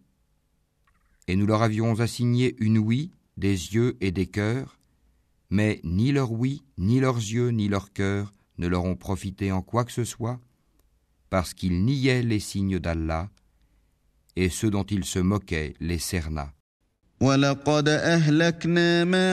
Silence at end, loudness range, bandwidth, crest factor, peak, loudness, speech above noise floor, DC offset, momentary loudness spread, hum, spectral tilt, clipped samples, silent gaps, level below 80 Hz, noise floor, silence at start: 0 s; 4 LU; 14 kHz; 18 dB; -8 dBFS; -25 LUFS; 45 dB; under 0.1%; 11 LU; none; -6 dB/octave; under 0.1%; 16.60-16.80 s; -46 dBFS; -69 dBFS; 1.3 s